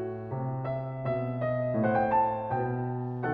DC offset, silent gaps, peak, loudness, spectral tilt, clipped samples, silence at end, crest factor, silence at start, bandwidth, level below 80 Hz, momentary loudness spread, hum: under 0.1%; none; -16 dBFS; -30 LUFS; -11.5 dB/octave; under 0.1%; 0 s; 14 dB; 0 s; 4.7 kHz; -58 dBFS; 8 LU; none